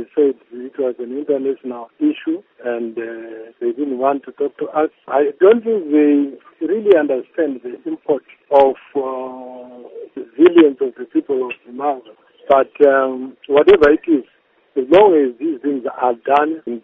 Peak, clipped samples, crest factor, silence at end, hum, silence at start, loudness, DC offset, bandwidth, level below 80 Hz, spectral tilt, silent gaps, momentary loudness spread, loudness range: 0 dBFS; under 0.1%; 16 dB; 0.05 s; none; 0 s; -16 LUFS; under 0.1%; 5.2 kHz; -54 dBFS; -3.5 dB/octave; none; 17 LU; 8 LU